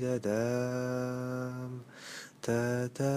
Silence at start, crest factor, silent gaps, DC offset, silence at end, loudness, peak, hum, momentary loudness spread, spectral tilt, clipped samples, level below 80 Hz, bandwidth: 0 s; 14 dB; none; under 0.1%; 0 s; -34 LUFS; -20 dBFS; none; 13 LU; -6.5 dB/octave; under 0.1%; -70 dBFS; 15 kHz